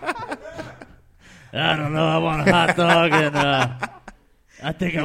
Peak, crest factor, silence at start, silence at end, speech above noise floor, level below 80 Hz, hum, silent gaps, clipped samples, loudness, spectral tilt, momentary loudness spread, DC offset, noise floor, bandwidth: 0 dBFS; 22 dB; 0 s; 0 s; 33 dB; -48 dBFS; none; none; under 0.1%; -19 LUFS; -5.5 dB/octave; 17 LU; under 0.1%; -51 dBFS; 14.5 kHz